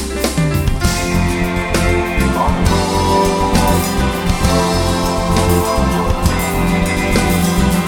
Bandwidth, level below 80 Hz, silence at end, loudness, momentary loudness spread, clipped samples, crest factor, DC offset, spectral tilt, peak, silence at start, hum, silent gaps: 18 kHz; -22 dBFS; 0 s; -15 LUFS; 3 LU; under 0.1%; 14 dB; under 0.1%; -5 dB/octave; 0 dBFS; 0 s; none; none